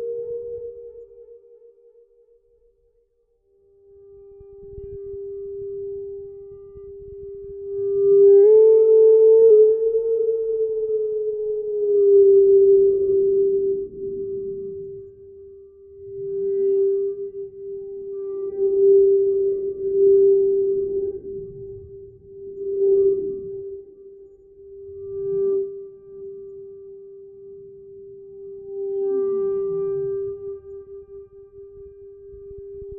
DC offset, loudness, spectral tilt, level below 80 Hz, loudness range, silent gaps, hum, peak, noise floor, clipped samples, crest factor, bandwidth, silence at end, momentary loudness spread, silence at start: under 0.1%; -19 LUFS; -13.5 dB/octave; -56 dBFS; 20 LU; none; none; -6 dBFS; -65 dBFS; under 0.1%; 14 dB; 1.3 kHz; 0 s; 26 LU; 0 s